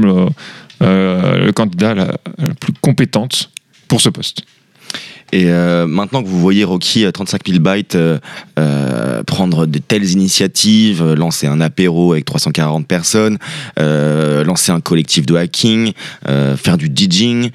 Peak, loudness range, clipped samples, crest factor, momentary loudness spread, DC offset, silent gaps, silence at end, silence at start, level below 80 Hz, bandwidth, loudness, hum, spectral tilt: 0 dBFS; 3 LU; under 0.1%; 12 dB; 8 LU; under 0.1%; none; 0 s; 0 s; -50 dBFS; 14.5 kHz; -13 LUFS; none; -5 dB/octave